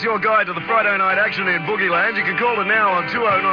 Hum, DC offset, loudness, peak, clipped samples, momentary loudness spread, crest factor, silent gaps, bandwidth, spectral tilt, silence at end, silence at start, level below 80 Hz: none; under 0.1%; -17 LUFS; -6 dBFS; under 0.1%; 3 LU; 12 dB; none; 5.4 kHz; -6.5 dB/octave; 0 s; 0 s; -58 dBFS